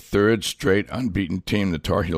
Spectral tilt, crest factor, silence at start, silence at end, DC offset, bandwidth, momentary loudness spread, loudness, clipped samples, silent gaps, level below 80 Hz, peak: -5.5 dB/octave; 16 dB; 0.1 s; 0 s; under 0.1%; 15.5 kHz; 6 LU; -22 LUFS; under 0.1%; none; -40 dBFS; -6 dBFS